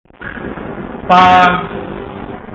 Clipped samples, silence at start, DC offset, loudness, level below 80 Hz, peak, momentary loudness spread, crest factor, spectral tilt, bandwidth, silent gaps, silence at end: under 0.1%; 0.2 s; under 0.1%; -9 LUFS; -38 dBFS; 0 dBFS; 19 LU; 14 dB; -6 dB/octave; 7.6 kHz; none; 0 s